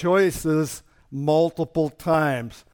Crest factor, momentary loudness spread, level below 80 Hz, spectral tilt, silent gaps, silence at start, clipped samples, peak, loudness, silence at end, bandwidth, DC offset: 14 dB; 10 LU; -50 dBFS; -6 dB/octave; none; 0 s; under 0.1%; -8 dBFS; -23 LUFS; 0.2 s; 18.5 kHz; under 0.1%